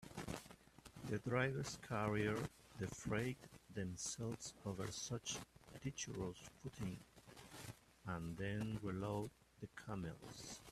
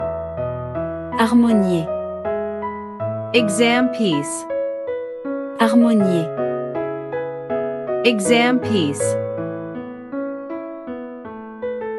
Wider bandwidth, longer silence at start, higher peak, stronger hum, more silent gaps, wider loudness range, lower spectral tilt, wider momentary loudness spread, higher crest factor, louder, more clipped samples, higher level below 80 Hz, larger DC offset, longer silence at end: first, 14.5 kHz vs 12 kHz; about the same, 0 s vs 0 s; second, -24 dBFS vs -2 dBFS; neither; neither; first, 5 LU vs 2 LU; about the same, -5 dB/octave vs -5 dB/octave; about the same, 15 LU vs 15 LU; about the same, 22 dB vs 18 dB; second, -46 LUFS vs -20 LUFS; neither; second, -68 dBFS vs -54 dBFS; neither; about the same, 0 s vs 0 s